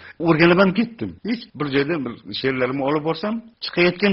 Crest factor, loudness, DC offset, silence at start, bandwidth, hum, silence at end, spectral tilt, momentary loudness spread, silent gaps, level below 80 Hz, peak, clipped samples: 20 dB; -21 LUFS; under 0.1%; 0 s; 5.8 kHz; none; 0 s; -4.5 dB/octave; 13 LU; none; -54 dBFS; -2 dBFS; under 0.1%